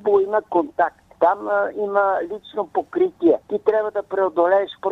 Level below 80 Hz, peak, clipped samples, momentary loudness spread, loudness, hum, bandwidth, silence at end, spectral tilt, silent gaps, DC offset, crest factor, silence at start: -62 dBFS; -4 dBFS; under 0.1%; 7 LU; -21 LUFS; none; 5.8 kHz; 0 s; -7 dB/octave; none; under 0.1%; 16 dB; 0.05 s